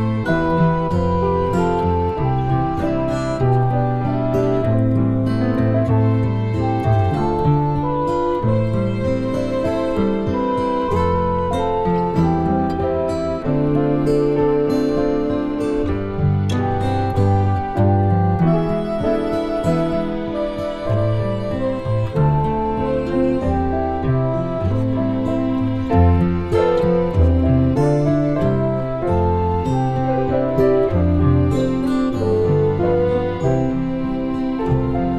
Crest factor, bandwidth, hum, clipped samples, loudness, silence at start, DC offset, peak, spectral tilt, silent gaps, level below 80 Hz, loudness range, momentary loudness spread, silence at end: 14 dB; 10 kHz; none; under 0.1%; -19 LUFS; 0 s; 0.4%; -2 dBFS; -9 dB/octave; none; -32 dBFS; 2 LU; 5 LU; 0 s